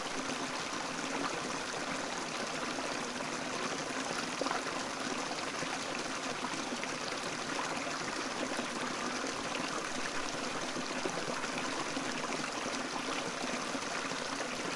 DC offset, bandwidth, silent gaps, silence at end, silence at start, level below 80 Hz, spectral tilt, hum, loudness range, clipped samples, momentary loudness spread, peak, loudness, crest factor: under 0.1%; 11.5 kHz; none; 0 s; 0 s; -66 dBFS; -2 dB/octave; none; 0 LU; under 0.1%; 1 LU; -18 dBFS; -36 LUFS; 20 dB